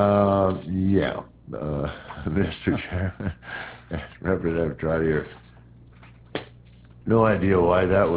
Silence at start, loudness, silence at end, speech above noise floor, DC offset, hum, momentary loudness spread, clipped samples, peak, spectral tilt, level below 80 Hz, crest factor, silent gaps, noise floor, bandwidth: 0 s; -24 LUFS; 0 s; 26 dB; under 0.1%; none; 16 LU; under 0.1%; -6 dBFS; -11.5 dB/octave; -40 dBFS; 18 dB; none; -49 dBFS; 4 kHz